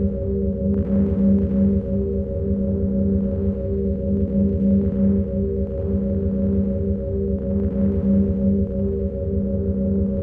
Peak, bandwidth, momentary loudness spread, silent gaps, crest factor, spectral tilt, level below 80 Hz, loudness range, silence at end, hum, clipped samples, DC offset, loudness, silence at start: -8 dBFS; 2.2 kHz; 5 LU; none; 12 dB; -14 dB/octave; -28 dBFS; 1 LU; 0 s; none; under 0.1%; under 0.1%; -21 LUFS; 0 s